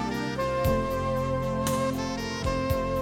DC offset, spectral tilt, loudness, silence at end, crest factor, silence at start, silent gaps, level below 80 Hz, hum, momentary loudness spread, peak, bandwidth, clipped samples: under 0.1%; -5.5 dB/octave; -28 LUFS; 0 s; 14 dB; 0 s; none; -40 dBFS; none; 4 LU; -14 dBFS; 18 kHz; under 0.1%